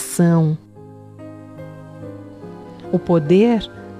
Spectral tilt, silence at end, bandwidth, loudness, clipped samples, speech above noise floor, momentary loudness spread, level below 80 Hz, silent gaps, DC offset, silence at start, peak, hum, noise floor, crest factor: -7 dB/octave; 0 s; 15 kHz; -17 LUFS; under 0.1%; 25 dB; 23 LU; -50 dBFS; none; under 0.1%; 0 s; -4 dBFS; none; -40 dBFS; 16 dB